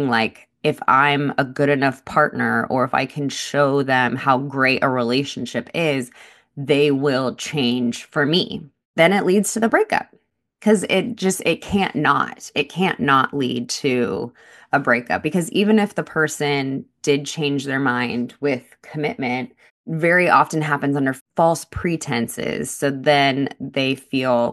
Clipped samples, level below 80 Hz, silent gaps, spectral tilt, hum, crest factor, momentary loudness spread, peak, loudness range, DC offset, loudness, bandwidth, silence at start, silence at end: under 0.1%; -54 dBFS; 8.85-8.94 s, 19.71-19.84 s, 21.21-21.26 s; -4.5 dB/octave; none; 18 dB; 9 LU; -2 dBFS; 2 LU; under 0.1%; -20 LUFS; 12.5 kHz; 0 s; 0 s